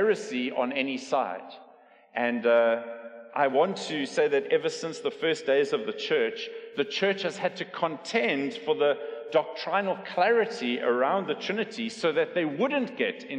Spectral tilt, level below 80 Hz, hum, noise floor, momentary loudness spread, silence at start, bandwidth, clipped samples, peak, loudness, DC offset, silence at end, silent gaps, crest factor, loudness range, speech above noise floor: -4.5 dB/octave; -86 dBFS; none; -56 dBFS; 8 LU; 0 s; 9.8 kHz; under 0.1%; -12 dBFS; -27 LUFS; under 0.1%; 0 s; none; 16 dB; 2 LU; 28 dB